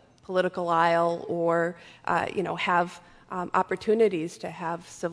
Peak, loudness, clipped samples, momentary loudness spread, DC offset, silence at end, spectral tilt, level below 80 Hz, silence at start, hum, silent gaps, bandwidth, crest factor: -8 dBFS; -27 LUFS; under 0.1%; 11 LU; under 0.1%; 0 s; -5.5 dB/octave; -66 dBFS; 0.3 s; none; none; 11 kHz; 18 dB